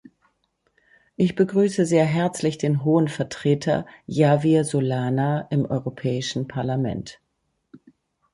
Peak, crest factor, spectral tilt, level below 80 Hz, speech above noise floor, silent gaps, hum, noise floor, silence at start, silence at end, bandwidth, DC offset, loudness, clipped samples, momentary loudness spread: -4 dBFS; 18 dB; -6.5 dB/octave; -58 dBFS; 48 dB; none; none; -70 dBFS; 1.2 s; 0.55 s; 11.5 kHz; under 0.1%; -22 LUFS; under 0.1%; 7 LU